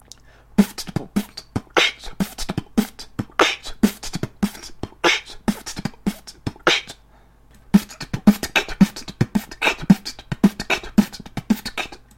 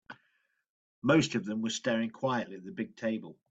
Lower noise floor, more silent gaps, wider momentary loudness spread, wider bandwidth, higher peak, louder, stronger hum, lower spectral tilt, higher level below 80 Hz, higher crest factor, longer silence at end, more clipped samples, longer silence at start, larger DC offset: second, -51 dBFS vs -75 dBFS; second, none vs 0.70-1.02 s; about the same, 12 LU vs 13 LU; first, 16.5 kHz vs 8.8 kHz; first, 0 dBFS vs -12 dBFS; first, -21 LUFS vs -32 LUFS; neither; about the same, -4.5 dB/octave vs -5 dB/octave; first, -42 dBFS vs -72 dBFS; about the same, 22 dB vs 20 dB; about the same, 0.2 s vs 0.2 s; neither; first, 0.6 s vs 0.1 s; neither